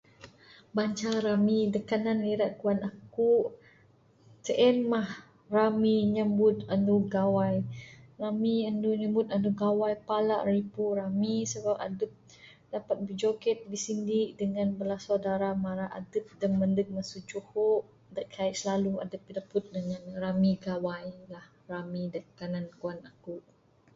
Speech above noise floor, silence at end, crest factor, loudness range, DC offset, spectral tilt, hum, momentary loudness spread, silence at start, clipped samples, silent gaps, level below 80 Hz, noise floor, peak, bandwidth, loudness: 33 dB; 0.55 s; 18 dB; 6 LU; under 0.1%; -6.5 dB/octave; none; 14 LU; 0.2 s; under 0.1%; none; -66 dBFS; -62 dBFS; -12 dBFS; 7.8 kHz; -30 LUFS